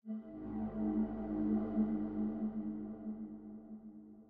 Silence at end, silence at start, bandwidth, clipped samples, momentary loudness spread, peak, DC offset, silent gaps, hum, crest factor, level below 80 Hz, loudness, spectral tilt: 0 s; 0.05 s; 3.1 kHz; under 0.1%; 15 LU; -24 dBFS; under 0.1%; none; none; 16 dB; -60 dBFS; -39 LUFS; -10.5 dB/octave